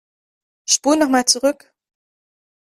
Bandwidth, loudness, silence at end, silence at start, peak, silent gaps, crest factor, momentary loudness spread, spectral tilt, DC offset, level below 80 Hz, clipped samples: 15.5 kHz; -16 LUFS; 1.2 s; 0.7 s; -2 dBFS; none; 20 dB; 16 LU; -0.5 dB/octave; under 0.1%; -62 dBFS; under 0.1%